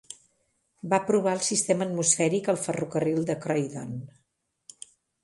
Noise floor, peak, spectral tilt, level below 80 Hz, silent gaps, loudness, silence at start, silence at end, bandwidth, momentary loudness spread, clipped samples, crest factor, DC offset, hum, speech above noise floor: -76 dBFS; -6 dBFS; -4 dB/octave; -68 dBFS; none; -26 LUFS; 0.1 s; 1.15 s; 11.5 kHz; 22 LU; under 0.1%; 22 dB; under 0.1%; none; 50 dB